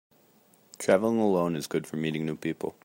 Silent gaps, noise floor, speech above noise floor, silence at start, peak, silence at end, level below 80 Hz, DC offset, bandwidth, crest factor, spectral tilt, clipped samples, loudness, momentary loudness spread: none; -62 dBFS; 34 dB; 0.8 s; -8 dBFS; 0.15 s; -68 dBFS; under 0.1%; 16 kHz; 20 dB; -6 dB/octave; under 0.1%; -28 LUFS; 9 LU